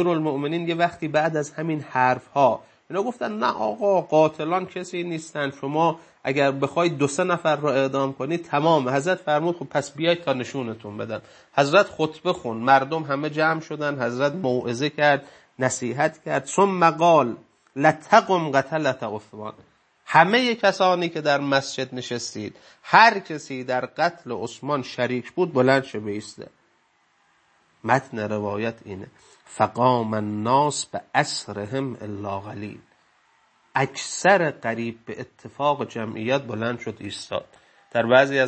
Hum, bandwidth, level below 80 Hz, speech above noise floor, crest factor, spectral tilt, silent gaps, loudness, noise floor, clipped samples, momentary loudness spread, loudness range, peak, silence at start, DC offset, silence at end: none; 8.8 kHz; -70 dBFS; 42 dB; 22 dB; -5 dB/octave; none; -23 LUFS; -64 dBFS; under 0.1%; 14 LU; 5 LU; 0 dBFS; 0 s; under 0.1%; 0 s